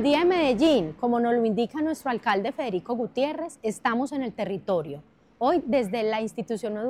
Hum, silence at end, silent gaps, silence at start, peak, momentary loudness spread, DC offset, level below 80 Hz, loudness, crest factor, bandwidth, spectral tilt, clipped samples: none; 0 s; none; 0 s; -12 dBFS; 10 LU; under 0.1%; -60 dBFS; -26 LUFS; 14 dB; 14 kHz; -5.5 dB/octave; under 0.1%